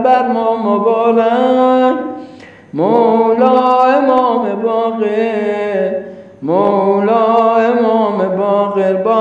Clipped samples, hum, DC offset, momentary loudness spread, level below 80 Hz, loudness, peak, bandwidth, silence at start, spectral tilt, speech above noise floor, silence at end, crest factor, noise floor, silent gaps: under 0.1%; none; under 0.1%; 7 LU; -62 dBFS; -12 LUFS; 0 dBFS; 7.6 kHz; 0 s; -8 dB/octave; 24 dB; 0 s; 12 dB; -36 dBFS; none